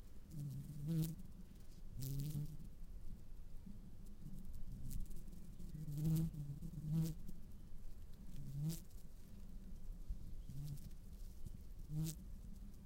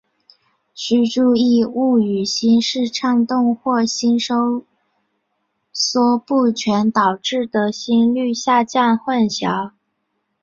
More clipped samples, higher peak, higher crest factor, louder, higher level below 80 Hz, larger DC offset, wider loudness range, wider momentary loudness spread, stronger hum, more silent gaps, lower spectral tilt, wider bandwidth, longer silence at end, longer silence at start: neither; second, -26 dBFS vs -2 dBFS; about the same, 18 dB vs 16 dB; second, -49 LUFS vs -17 LUFS; first, -52 dBFS vs -62 dBFS; neither; first, 8 LU vs 3 LU; first, 17 LU vs 6 LU; neither; neither; first, -7 dB/octave vs -4.5 dB/octave; first, 16 kHz vs 7.6 kHz; second, 0 s vs 0.75 s; second, 0 s vs 0.75 s